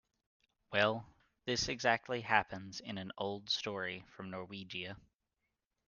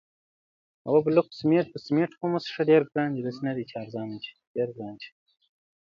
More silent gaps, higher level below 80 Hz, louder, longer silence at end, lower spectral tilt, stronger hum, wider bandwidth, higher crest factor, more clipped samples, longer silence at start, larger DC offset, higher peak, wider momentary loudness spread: second, none vs 4.47-4.55 s; about the same, -68 dBFS vs -72 dBFS; second, -37 LUFS vs -27 LUFS; first, 0.9 s vs 0.75 s; second, -3.5 dB/octave vs -8 dB/octave; neither; first, 10 kHz vs 7 kHz; first, 26 dB vs 20 dB; neither; second, 0.7 s vs 0.85 s; neither; second, -14 dBFS vs -8 dBFS; second, 14 LU vs 17 LU